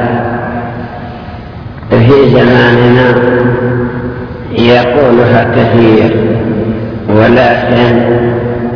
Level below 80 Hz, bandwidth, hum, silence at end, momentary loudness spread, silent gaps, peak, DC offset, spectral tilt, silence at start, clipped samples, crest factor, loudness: -32 dBFS; 5.4 kHz; none; 0 s; 16 LU; none; 0 dBFS; under 0.1%; -9 dB/octave; 0 s; 3%; 8 dB; -8 LUFS